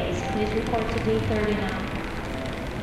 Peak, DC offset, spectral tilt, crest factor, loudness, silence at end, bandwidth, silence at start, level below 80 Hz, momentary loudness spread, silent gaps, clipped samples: -10 dBFS; under 0.1%; -6 dB/octave; 16 dB; -27 LUFS; 0 s; 15 kHz; 0 s; -36 dBFS; 7 LU; none; under 0.1%